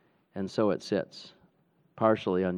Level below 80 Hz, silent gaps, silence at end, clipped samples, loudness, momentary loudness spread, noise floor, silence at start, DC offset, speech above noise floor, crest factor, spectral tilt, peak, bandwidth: -72 dBFS; none; 0 s; under 0.1%; -29 LUFS; 17 LU; -68 dBFS; 0.35 s; under 0.1%; 40 dB; 22 dB; -7 dB/octave; -10 dBFS; 10.5 kHz